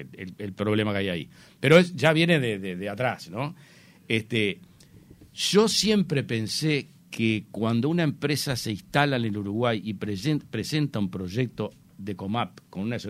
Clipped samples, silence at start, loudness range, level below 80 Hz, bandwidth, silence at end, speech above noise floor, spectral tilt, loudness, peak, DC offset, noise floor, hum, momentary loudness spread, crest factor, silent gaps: under 0.1%; 0 s; 5 LU; -60 dBFS; 16 kHz; 0 s; 26 dB; -5 dB/octave; -26 LUFS; -4 dBFS; under 0.1%; -52 dBFS; none; 15 LU; 22 dB; none